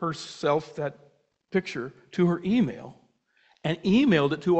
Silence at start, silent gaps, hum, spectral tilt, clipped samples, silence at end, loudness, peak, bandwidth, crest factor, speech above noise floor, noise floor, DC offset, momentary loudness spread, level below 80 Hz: 0 s; none; none; -7 dB/octave; under 0.1%; 0 s; -26 LUFS; -8 dBFS; 8.4 kHz; 18 dB; 40 dB; -65 dBFS; under 0.1%; 13 LU; -60 dBFS